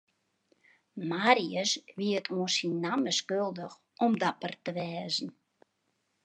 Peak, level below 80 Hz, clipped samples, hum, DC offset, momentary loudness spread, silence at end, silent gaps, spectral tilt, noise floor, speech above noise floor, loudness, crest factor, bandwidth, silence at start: -6 dBFS; -86 dBFS; under 0.1%; none; under 0.1%; 13 LU; 0.95 s; none; -3.5 dB/octave; -78 dBFS; 47 dB; -30 LUFS; 26 dB; 10.5 kHz; 0.95 s